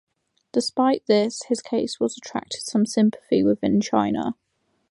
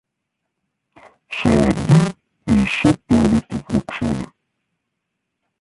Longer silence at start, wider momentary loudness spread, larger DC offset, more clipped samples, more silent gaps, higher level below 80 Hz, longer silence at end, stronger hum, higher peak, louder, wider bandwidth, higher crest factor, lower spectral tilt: second, 0.55 s vs 1.3 s; about the same, 9 LU vs 11 LU; neither; neither; neither; second, -60 dBFS vs -38 dBFS; second, 0.6 s vs 1.35 s; neither; about the same, -4 dBFS vs -2 dBFS; second, -23 LUFS vs -18 LUFS; about the same, 11.5 kHz vs 11.5 kHz; about the same, 18 dB vs 16 dB; second, -5 dB/octave vs -7 dB/octave